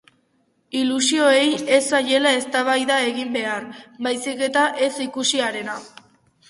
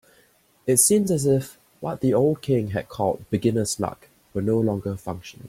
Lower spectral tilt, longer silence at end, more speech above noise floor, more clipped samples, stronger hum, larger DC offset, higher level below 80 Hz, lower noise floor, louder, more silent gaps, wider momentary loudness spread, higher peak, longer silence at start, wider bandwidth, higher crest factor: second, -1.5 dB/octave vs -5.5 dB/octave; first, 0.6 s vs 0 s; first, 45 dB vs 37 dB; neither; neither; neither; second, -70 dBFS vs -56 dBFS; first, -65 dBFS vs -60 dBFS; first, -20 LUFS vs -23 LUFS; neither; second, 12 LU vs 15 LU; about the same, -4 dBFS vs -4 dBFS; about the same, 0.75 s vs 0.65 s; second, 11.5 kHz vs 16.5 kHz; about the same, 18 dB vs 20 dB